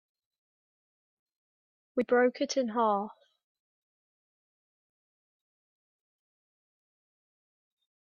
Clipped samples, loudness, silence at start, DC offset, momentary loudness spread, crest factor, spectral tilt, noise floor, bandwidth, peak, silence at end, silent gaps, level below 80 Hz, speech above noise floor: under 0.1%; -29 LUFS; 1.95 s; under 0.1%; 10 LU; 22 dB; -4 dB/octave; under -90 dBFS; 7.2 kHz; -14 dBFS; 4.95 s; none; -82 dBFS; over 62 dB